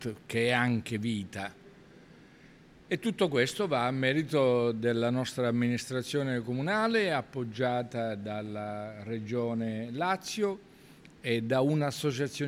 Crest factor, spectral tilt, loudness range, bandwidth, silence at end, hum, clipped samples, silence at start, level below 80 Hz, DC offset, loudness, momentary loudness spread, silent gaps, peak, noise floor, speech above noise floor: 20 dB; -5.5 dB/octave; 5 LU; 15.5 kHz; 0 s; none; under 0.1%; 0 s; -68 dBFS; under 0.1%; -31 LUFS; 10 LU; none; -12 dBFS; -56 dBFS; 26 dB